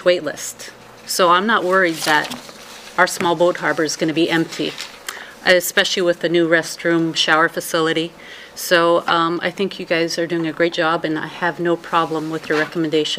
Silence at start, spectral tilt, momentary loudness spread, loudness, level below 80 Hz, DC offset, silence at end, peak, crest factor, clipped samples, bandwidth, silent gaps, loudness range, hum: 0 s; -3.5 dB/octave; 14 LU; -18 LUFS; -62 dBFS; under 0.1%; 0 s; 0 dBFS; 18 dB; under 0.1%; 16 kHz; none; 3 LU; none